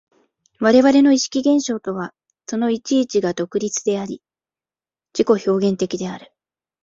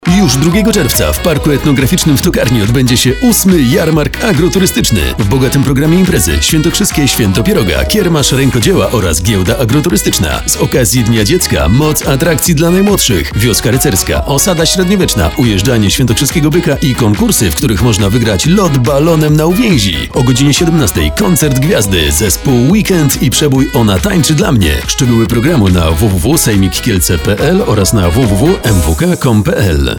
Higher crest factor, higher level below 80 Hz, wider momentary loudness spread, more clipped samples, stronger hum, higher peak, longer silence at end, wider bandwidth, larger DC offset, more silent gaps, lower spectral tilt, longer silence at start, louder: first, 18 dB vs 8 dB; second, -60 dBFS vs -22 dBFS; first, 16 LU vs 3 LU; second, under 0.1% vs 0.1%; neither; about the same, -2 dBFS vs 0 dBFS; first, 0.65 s vs 0 s; second, 7.8 kHz vs over 20 kHz; second, under 0.1% vs 0.4%; neither; about the same, -4.5 dB/octave vs -4.5 dB/octave; first, 0.6 s vs 0 s; second, -19 LUFS vs -9 LUFS